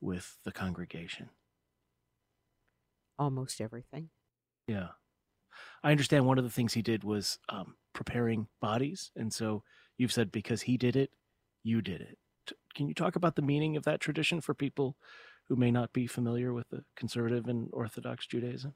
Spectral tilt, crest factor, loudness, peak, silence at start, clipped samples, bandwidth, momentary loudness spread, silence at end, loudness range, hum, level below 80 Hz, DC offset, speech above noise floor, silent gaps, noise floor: -6 dB/octave; 24 dB; -33 LUFS; -10 dBFS; 0 s; under 0.1%; 16 kHz; 16 LU; 0.05 s; 10 LU; none; -66 dBFS; under 0.1%; 49 dB; none; -82 dBFS